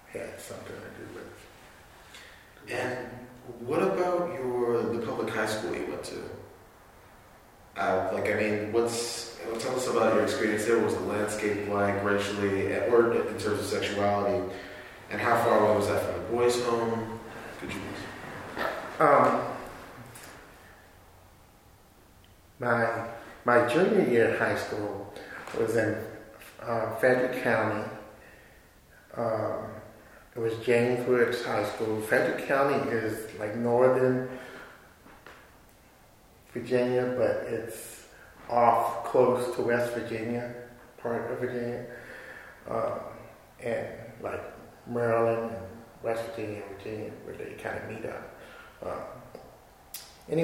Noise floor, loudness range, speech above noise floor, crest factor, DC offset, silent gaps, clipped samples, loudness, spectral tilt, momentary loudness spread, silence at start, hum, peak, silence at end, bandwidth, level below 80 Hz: -57 dBFS; 9 LU; 29 dB; 24 dB; under 0.1%; none; under 0.1%; -28 LUFS; -5.5 dB/octave; 20 LU; 0.1 s; none; -6 dBFS; 0 s; 16 kHz; -62 dBFS